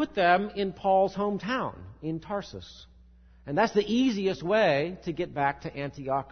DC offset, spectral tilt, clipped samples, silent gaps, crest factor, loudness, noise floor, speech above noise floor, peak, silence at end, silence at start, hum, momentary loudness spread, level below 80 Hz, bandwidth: under 0.1%; -6 dB/octave; under 0.1%; none; 20 dB; -28 LUFS; -55 dBFS; 27 dB; -8 dBFS; 0 s; 0 s; none; 13 LU; -56 dBFS; 6.6 kHz